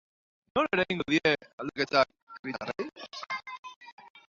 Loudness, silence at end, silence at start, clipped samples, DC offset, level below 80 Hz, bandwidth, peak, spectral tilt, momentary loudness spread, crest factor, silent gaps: -30 LUFS; 0.1 s; 0.55 s; under 0.1%; under 0.1%; -66 dBFS; 7.6 kHz; -10 dBFS; -5 dB/octave; 18 LU; 22 dB; 1.53-1.58 s, 2.22-2.27 s, 2.39-2.44 s, 3.59-3.63 s, 3.76-3.81 s, 3.92-3.98 s, 4.10-4.15 s